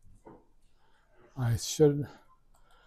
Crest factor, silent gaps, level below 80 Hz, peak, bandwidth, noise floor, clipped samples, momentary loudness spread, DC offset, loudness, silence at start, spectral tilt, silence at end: 22 dB; none; -56 dBFS; -12 dBFS; 15.5 kHz; -63 dBFS; under 0.1%; 17 LU; under 0.1%; -29 LUFS; 0.25 s; -6 dB/octave; 0.75 s